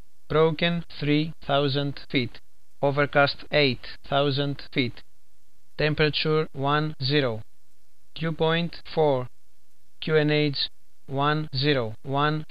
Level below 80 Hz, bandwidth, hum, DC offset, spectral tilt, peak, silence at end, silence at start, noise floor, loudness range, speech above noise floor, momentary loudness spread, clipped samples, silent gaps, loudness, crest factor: -50 dBFS; 5.4 kHz; none; 2%; -7.5 dB/octave; -6 dBFS; 0.05 s; 0.3 s; -67 dBFS; 2 LU; 43 dB; 8 LU; under 0.1%; none; -25 LUFS; 18 dB